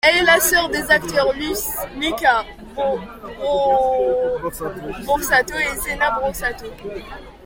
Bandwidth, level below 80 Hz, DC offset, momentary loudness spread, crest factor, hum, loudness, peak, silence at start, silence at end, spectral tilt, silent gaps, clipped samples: 17 kHz; -40 dBFS; under 0.1%; 17 LU; 18 dB; none; -19 LUFS; -2 dBFS; 0.05 s; 0 s; -2 dB/octave; none; under 0.1%